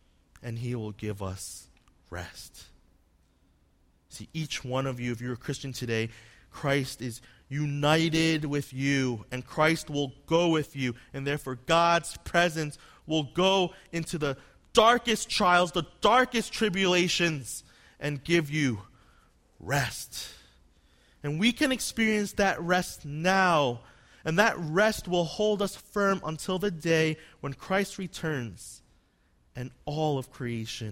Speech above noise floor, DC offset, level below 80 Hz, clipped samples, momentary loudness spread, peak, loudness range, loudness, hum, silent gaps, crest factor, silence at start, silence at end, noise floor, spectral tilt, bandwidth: 38 dB; under 0.1%; -56 dBFS; under 0.1%; 16 LU; -6 dBFS; 11 LU; -28 LUFS; none; none; 24 dB; 0.4 s; 0 s; -66 dBFS; -4.5 dB/octave; 16.5 kHz